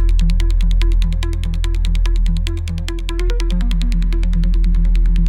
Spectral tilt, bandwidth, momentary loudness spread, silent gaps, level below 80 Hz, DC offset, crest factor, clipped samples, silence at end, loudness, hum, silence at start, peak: -6.5 dB/octave; 9.2 kHz; 5 LU; none; -14 dBFS; under 0.1%; 10 dB; under 0.1%; 0 s; -19 LUFS; none; 0 s; -4 dBFS